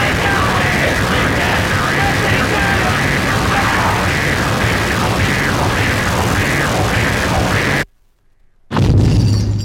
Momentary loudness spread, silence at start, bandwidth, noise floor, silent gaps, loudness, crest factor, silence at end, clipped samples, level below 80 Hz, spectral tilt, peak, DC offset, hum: 2 LU; 0 s; 17 kHz; -52 dBFS; none; -14 LUFS; 14 dB; 0 s; under 0.1%; -26 dBFS; -5 dB/octave; -2 dBFS; under 0.1%; none